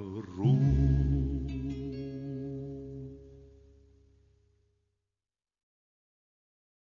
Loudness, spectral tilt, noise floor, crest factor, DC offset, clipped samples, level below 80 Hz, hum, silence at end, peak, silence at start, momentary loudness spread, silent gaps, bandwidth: -31 LUFS; -10 dB/octave; under -90 dBFS; 18 dB; under 0.1%; under 0.1%; -40 dBFS; none; 3.45 s; -16 dBFS; 0 s; 18 LU; none; 6.4 kHz